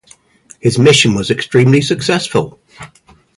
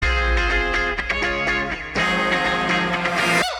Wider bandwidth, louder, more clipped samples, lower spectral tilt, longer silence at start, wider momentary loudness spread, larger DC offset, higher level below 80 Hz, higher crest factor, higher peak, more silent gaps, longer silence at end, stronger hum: second, 11.5 kHz vs 15.5 kHz; first, -12 LUFS vs -20 LUFS; neither; about the same, -5 dB/octave vs -4 dB/octave; first, 0.65 s vs 0 s; first, 10 LU vs 3 LU; neither; second, -46 dBFS vs -28 dBFS; about the same, 14 dB vs 14 dB; first, 0 dBFS vs -6 dBFS; neither; first, 0.5 s vs 0 s; neither